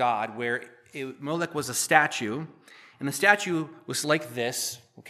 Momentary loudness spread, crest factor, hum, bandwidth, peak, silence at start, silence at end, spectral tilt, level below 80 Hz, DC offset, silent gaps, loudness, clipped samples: 15 LU; 26 dB; none; 15 kHz; -2 dBFS; 0 s; 0 s; -3 dB/octave; -76 dBFS; under 0.1%; none; -26 LUFS; under 0.1%